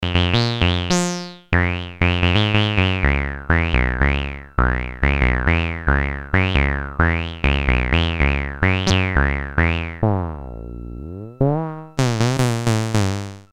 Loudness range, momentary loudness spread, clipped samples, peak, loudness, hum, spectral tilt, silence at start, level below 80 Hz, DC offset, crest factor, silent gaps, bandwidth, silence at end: 3 LU; 7 LU; under 0.1%; 0 dBFS; -19 LUFS; none; -5.5 dB/octave; 0 s; -26 dBFS; under 0.1%; 20 dB; none; 13 kHz; 0.1 s